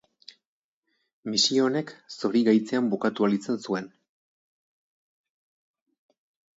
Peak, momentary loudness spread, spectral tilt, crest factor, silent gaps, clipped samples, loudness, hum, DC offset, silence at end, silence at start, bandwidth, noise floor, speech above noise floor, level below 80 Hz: -10 dBFS; 11 LU; -4 dB/octave; 20 dB; none; under 0.1%; -25 LUFS; none; under 0.1%; 2.7 s; 1.25 s; 8 kHz; -77 dBFS; 52 dB; -78 dBFS